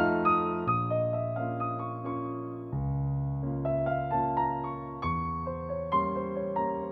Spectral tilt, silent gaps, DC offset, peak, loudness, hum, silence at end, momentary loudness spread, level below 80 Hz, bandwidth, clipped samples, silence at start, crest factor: -10.5 dB/octave; none; under 0.1%; -14 dBFS; -31 LUFS; none; 0 s; 7 LU; -48 dBFS; 4.8 kHz; under 0.1%; 0 s; 16 dB